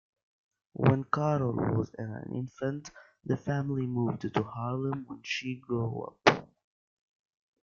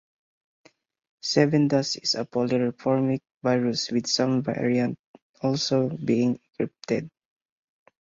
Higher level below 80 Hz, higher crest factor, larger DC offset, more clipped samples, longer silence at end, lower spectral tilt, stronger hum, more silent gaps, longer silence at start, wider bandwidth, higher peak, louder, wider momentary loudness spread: about the same, -64 dBFS vs -66 dBFS; first, 28 dB vs 20 dB; neither; neither; first, 1.15 s vs 0.9 s; first, -6.5 dB/octave vs -5 dB/octave; neither; second, none vs 3.37-3.41 s, 4.99-5.14 s, 5.22-5.34 s; second, 0.8 s vs 1.25 s; about the same, 7.2 kHz vs 7.8 kHz; about the same, -4 dBFS vs -6 dBFS; second, -31 LUFS vs -25 LUFS; first, 12 LU vs 8 LU